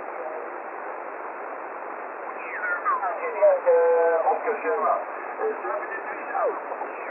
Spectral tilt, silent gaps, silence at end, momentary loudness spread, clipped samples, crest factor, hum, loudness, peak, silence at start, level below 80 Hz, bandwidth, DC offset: -7 dB/octave; none; 0 s; 14 LU; under 0.1%; 16 dB; none; -26 LUFS; -10 dBFS; 0 s; under -90 dBFS; 2.9 kHz; under 0.1%